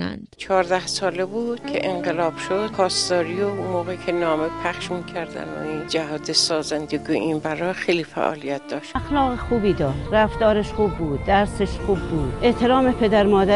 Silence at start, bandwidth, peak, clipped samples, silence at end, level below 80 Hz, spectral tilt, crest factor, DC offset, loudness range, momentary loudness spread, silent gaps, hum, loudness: 0 s; 11.5 kHz; -4 dBFS; under 0.1%; 0 s; -38 dBFS; -4.5 dB/octave; 18 dB; under 0.1%; 3 LU; 10 LU; none; none; -22 LUFS